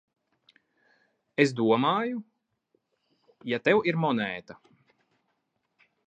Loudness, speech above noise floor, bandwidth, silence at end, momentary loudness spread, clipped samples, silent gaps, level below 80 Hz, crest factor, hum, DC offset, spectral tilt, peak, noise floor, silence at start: -26 LUFS; 52 dB; 9.2 kHz; 1.55 s; 14 LU; under 0.1%; none; -76 dBFS; 26 dB; none; under 0.1%; -6 dB/octave; -6 dBFS; -77 dBFS; 1.4 s